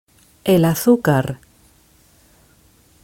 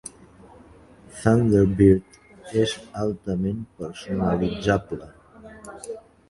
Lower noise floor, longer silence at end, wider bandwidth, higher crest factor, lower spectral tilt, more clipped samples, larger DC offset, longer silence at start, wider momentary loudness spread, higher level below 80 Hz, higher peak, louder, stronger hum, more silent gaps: first, -53 dBFS vs -49 dBFS; first, 1.7 s vs 0.3 s; first, 17 kHz vs 11.5 kHz; about the same, 20 dB vs 20 dB; about the same, -6.5 dB/octave vs -7 dB/octave; neither; neither; first, 0.45 s vs 0.05 s; second, 13 LU vs 21 LU; second, -52 dBFS vs -44 dBFS; first, 0 dBFS vs -4 dBFS; first, -17 LUFS vs -22 LUFS; neither; neither